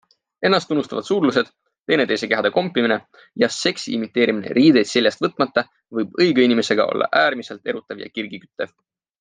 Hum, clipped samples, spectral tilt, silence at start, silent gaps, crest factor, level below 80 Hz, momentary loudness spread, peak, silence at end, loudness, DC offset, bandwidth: none; under 0.1%; -4.5 dB/octave; 0.4 s; 1.80-1.84 s; 18 dB; -68 dBFS; 14 LU; -2 dBFS; 0.55 s; -19 LUFS; under 0.1%; 9.8 kHz